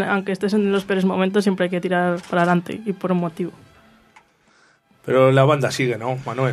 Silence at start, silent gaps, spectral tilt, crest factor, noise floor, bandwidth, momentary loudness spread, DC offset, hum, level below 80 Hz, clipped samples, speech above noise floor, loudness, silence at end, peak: 0 s; none; -6.5 dB/octave; 20 dB; -57 dBFS; 13.5 kHz; 10 LU; under 0.1%; none; -62 dBFS; under 0.1%; 38 dB; -20 LUFS; 0 s; -2 dBFS